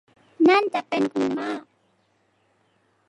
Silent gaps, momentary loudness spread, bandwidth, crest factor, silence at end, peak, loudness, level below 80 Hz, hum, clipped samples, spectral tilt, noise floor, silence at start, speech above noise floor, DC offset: none; 13 LU; 11 kHz; 18 dB; 1.5 s; -8 dBFS; -22 LUFS; -74 dBFS; none; under 0.1%; -5.5 dB/octave; -66 dBFS; 0.4 s; 43 dB; under 0.1%